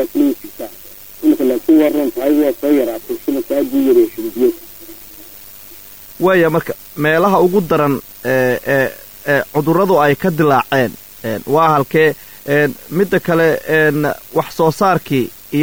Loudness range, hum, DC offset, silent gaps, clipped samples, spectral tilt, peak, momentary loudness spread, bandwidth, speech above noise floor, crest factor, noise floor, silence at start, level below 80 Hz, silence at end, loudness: 3 LU; none; 0.7%; none; under 0.1%; -6.5 dB/octave; -2 dBFS; 18 LU; over 20 kHz; 23 dB; 12 dB; -36 dBFS; 0 s; -50 dBFS; 0 s; -15 LUFS